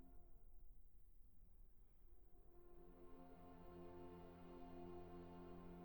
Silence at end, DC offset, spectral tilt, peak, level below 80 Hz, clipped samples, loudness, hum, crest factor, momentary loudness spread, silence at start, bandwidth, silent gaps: 0 s; under 0.1%; -8 dB/octave; -46 dBFS; -66 dBFS; under 0.1%; -61 LUFS; none; 16 dB; 9 LU; 0 s; over 20 kHz; none